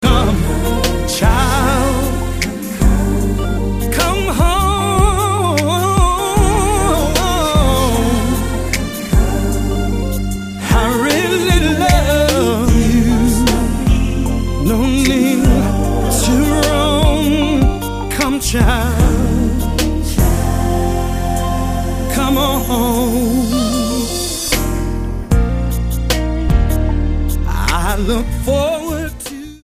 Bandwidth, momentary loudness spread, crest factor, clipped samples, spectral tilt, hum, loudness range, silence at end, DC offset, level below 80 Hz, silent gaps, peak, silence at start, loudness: 15.5 kHz; 6 LU; 14 dB; under 0.1%; -5 dB/octave; none; 3 LU; 0.05 s; under 0.1%; -18 dBFS; none; 0 dBFS; 0 s; -15 LUFS